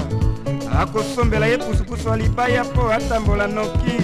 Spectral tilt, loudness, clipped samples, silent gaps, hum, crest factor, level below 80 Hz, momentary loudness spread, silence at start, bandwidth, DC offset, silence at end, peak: -6.5 dB/octave; -20 LUFS; under 0.1%; none; none; 14 dB; -26 dBFS; 4 LU; 0 s; 15 kHz; under 0.1%; 0 s; -4 dBFS